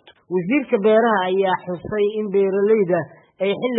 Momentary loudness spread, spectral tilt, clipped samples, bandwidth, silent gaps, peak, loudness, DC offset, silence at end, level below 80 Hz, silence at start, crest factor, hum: 9 LU; -11 dB/octave; under 0.1%; 4 kHz; none; -6 dBFS; -19 LUFS; under 0.1%; 0 s; -60 dBFS; 0.3 s; 14 dB; none